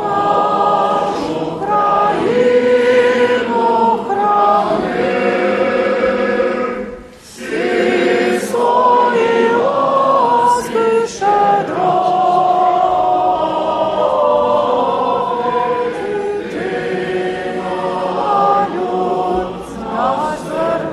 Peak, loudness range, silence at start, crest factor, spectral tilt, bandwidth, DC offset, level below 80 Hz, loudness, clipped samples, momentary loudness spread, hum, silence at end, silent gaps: -2 dBFS; 4 LU; 0 s; 12 dB; -5 dB/octave; 13 kHz; under 0.1%; -48 dBFS; -15 LUFS; under 0.1%; 8 LU; none; 0 s; none